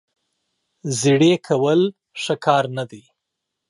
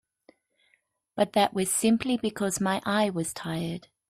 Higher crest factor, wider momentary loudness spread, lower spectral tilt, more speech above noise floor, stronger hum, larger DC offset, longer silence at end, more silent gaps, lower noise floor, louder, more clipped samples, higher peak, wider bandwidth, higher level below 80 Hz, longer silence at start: about the same, 18 dB vs 20 dB; first, 14 LU vs 8 LU; about the same, -5 dB/octave vs -4 dB/octave; first, 62 dB vs 44 dB; neither; neither; first, 0.7 s vs 0.3 s; neither; first, -80 dBFS vs -71 dBFS; first, -19 LUFS vs -27 LUFS; neither; first, -2 dBFS vs -10 dBFS; second, 11.5 kHz vs 15.5 kHz; second, -70 dBFS vs -64 dBFS; second, 0.85 s vs 1.15 s